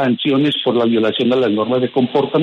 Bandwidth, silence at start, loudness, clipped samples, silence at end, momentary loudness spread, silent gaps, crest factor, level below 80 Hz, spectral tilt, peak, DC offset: 6.8 kHz; 0 s; -16 LUFS; under 0.1%; 0 s; 1 LU; none; 12 dB; -62 dBFS; -7.5 dB/octave; -4 dBFS; under 0.1%